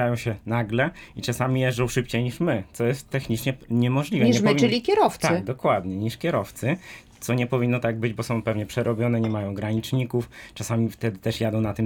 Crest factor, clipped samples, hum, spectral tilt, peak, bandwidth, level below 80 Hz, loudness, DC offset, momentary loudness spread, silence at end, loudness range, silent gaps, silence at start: 18 dB; under 0.1%; none; -6 dB/octave; -6 dBFS; 18 kHz; -52 dBFS; -24 LUFS; under 0.1%; 8 LU; 0 s; 4 LU; none; 0 s